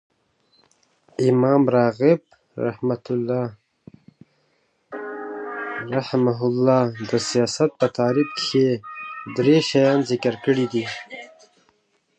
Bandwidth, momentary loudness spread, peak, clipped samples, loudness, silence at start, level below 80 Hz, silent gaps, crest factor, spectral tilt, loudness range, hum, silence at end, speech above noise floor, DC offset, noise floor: 9.4 kHz; 16 LU; -4 dBFS; under 0.1%; -21 LUFS; 1.2 s; -66 dBFS; none; 18 dB; -6 dB/octave; 9 LU; none; 0.95 s; 47 dB; under 0.1%; -66 dBFS